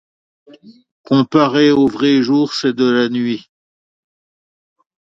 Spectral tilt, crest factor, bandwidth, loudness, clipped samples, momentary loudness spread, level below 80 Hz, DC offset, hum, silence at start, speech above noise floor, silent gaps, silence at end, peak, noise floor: -6 dB/octave; 16 dB; 7.6 kHz; -14 LUFS; under 0.1%; 7 LU; -58 dBFS; under 0.1%; none; 0.65 s; over 76 dB; 0.91-1.04 s; 1.65 s; 0 dBFS; under -90 dBFS